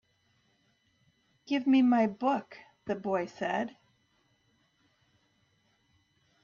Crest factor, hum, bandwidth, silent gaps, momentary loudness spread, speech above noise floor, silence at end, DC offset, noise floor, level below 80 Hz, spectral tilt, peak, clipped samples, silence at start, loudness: 18 dB; none; 7 kHz; none; 13 LU; 43 dB; 2.75 s; under 0.1%; -72 dBFS; -76 dBFS; -6.5 dB/octave; -16 dBFS; under 0.1%; 1.5 s; -30 LUFS